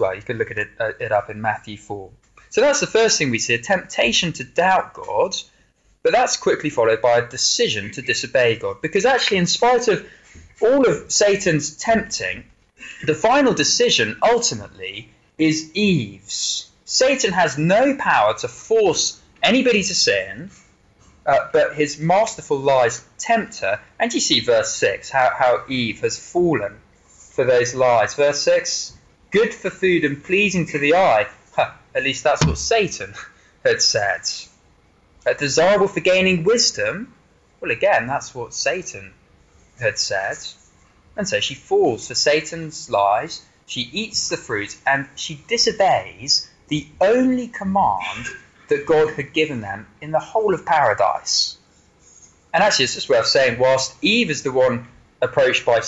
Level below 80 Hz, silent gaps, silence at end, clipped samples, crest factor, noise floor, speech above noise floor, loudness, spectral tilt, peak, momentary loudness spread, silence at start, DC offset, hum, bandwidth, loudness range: -50 dBFS; none; 0 s; under 0.1%; 16 dB; -58 dBFS; 39 dB; -19 LUFS; -3 dB/octave; -2 dBFS; 11 LU; 0 s; under 0.1%; none; 8.2 kHz; 3 LU